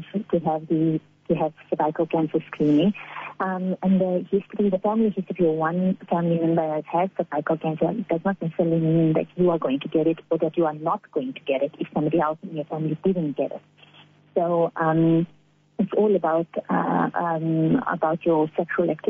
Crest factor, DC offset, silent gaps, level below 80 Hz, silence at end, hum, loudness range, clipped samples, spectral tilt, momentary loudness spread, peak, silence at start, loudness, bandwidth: 14 dB; under 0.1%; none; -62 dBFS; 0 s; none; 2 LU; under 0.1%; -7.5 dB/octave; 7 LU; -8 dBFS; 0 s; -24 LUFS; 3.7 kHz